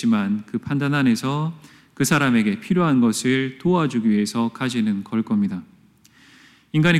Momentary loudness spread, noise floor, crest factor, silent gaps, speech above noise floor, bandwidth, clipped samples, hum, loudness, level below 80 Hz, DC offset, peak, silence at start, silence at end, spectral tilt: 8 LU; -53 dBFS; 16 dB; none; 34 dB; 15 kHz; under 0.1%; none; -21 LUFS; -60 dBFS; under 0.1%; -6 dBFS; 0 s; 0 s; -5.5 dB/octave